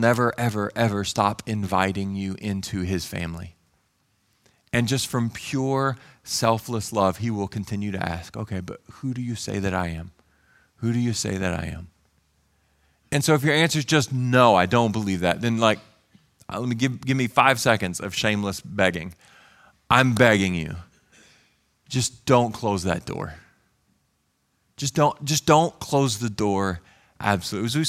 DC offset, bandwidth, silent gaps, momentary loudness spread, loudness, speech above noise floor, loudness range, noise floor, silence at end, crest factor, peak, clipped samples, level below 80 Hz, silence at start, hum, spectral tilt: under 0.1%; 16 kHz; none; 13 LU; -23 LUFS; 47 dB; 8 LU; -70 dBFS; 0 s; 24 dB; 0 dBFS; under 0.1%; -52 dBFS; 0 s; none; -5 dB/octave